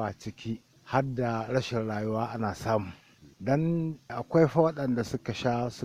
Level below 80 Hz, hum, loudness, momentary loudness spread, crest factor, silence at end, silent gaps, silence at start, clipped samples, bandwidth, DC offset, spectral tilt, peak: -58 dBFS; none; -30 LUFS; 13 LU; 20 dB; 0 s; none; 0 s; under 0.1%; 15 kHz; under 0.1%; -7 dB/octave; -8 dBFS